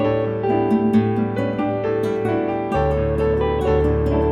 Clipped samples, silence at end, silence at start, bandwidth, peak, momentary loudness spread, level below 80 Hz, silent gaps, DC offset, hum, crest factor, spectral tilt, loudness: under 0.1%; 0 s; 0 s; 11.5 kHz; -6 dBFS; 4 LU; -30 dBFS; none; under 0.1%; none; 14 dB; -9 dB/octave; -20 LUFS